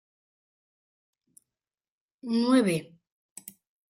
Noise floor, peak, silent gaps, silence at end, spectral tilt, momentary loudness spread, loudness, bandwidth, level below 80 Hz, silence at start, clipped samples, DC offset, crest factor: under -90 dBFS; -10 dBFS; none; 1.05 s; -5.5 dB/octave; 24 LU; -26 LUFS; 16 kHz; -76 dBFS; 2.25 s; under 0.1%; under 0.1%; 22 dB